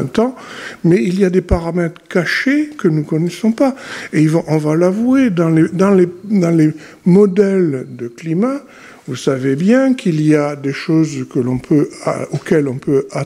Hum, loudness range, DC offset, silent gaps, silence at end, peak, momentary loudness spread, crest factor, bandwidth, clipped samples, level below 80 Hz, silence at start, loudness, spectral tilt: none; 3 LU; under 0.1%; none; 0 s; 0 dBFS; 9 LU; 14 dB; 13.5 kHz; under 0.1%; -36 dBFS; 0 s; -15 LUFS; -7.5 dB/octave